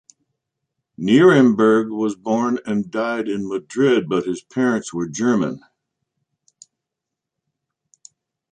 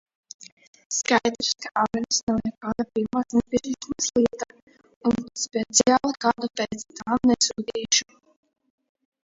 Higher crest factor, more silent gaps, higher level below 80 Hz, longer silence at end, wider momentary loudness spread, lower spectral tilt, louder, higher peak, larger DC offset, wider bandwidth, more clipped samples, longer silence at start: about the same, 18 dB vs 22 dB; second, none vs 0.52-0.57 s, 0.67-0.73 s, 0.85-0.90 s, 2.23-2.27 s, 4.62-4.67 s, 4.96-5.01 s; second, -62 dBFS vs -56 dBFS; first, 2.95 s vs 1.25 s; first, 13 LU vs 10 LU; first, -6 dB/octave vs -2.5 dB/octave; first, -19 LUFS vs -24 LUFS; about the same, -2 dBFS vs -4 dBFS; neither; first, 9.4 kHz vs 7.8 kHz; neither; first, 1 s vs 0.4 s